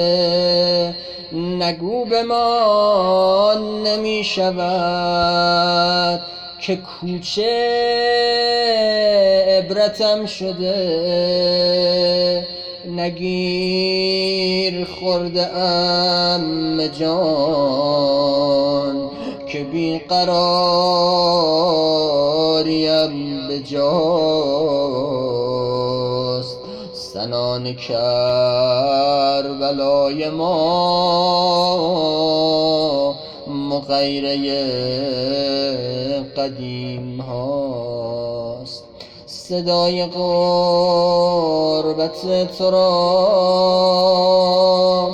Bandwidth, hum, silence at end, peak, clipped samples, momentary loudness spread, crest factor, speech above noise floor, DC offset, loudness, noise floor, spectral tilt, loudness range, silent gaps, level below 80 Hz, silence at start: 9.4 kHz; none; 0 s; -4 dBFS; under 0.1%; 10 LU; 14 dB; 22 dB; under 0.1%; -17 LUFS; -39 dBFS; -5.5 dB/octave; 5 LU; none; -50 dBFS; 0 s